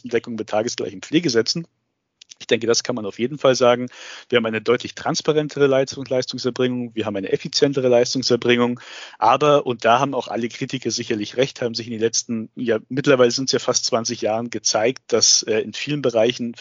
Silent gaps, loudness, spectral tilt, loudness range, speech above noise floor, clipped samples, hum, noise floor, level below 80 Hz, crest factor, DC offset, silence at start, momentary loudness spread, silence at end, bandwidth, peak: none; -20 LUFS; -3.5 dB/octave; 3 LU; 35 dB; under 0.1%; none; -55 dBFS; -66 dBFS; 18 dB; under 0.1%; 0.05 s; 9 LU; 0 s; 7.6 kHz; -2 dBFS